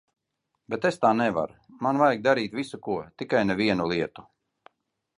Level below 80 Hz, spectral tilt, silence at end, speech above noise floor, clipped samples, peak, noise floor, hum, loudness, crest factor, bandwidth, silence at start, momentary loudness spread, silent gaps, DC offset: -62 dBFS; -6 dB/octave; 0.95 s; 55 dB; under 0.1%; -6 dBFS; -80 dBFS; none; -26 LUFS; 20 dB; 11.5 kHz; 0.7 s; 11 LU; none; under 0.1%